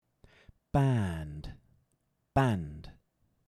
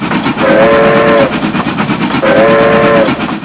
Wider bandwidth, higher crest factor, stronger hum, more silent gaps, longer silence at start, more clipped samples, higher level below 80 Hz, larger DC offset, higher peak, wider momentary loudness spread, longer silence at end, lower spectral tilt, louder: first, 12 kHz vs 4 kHz; first, 22 dB vs 8 dB; neither; neither; first, 0.75 s vs 0 s; second, under 0.1% vs 1%; second, -52 dBFS vs -36 dBFS; second, under 0.1% vs 0.2%; second, -12 dBFS vs 0 dBFS; first, 19 LU vs 7 LU; first, 0.6 s vs 0 s; second, -8 dB/octave vs -10 dB/octave; second, -31 LUFS vs -8 LUFS